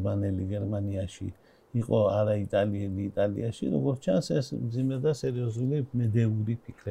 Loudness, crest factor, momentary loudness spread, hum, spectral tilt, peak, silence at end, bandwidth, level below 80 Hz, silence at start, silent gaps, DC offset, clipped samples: -29 LUFS; 16 dB; 8 LU; none; -8 dB/octave; -12 dBFS; 0 s; 10.5 kHz; -58 dBFS; 0 s; none; under 0.1%; under 0.1%